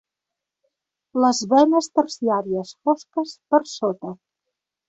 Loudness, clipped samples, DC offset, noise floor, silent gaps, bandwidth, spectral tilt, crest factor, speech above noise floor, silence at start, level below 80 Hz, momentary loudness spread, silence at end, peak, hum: -21 LUFS; under 0.1%; under 0.1%; -85 dBFS; none; 8.2 kHz; -4.5 dB/octave; 20 dB; 65 dB; 1.15 s; -68 dBFS; 12 LU; 0.75 s; -4 dBFS; none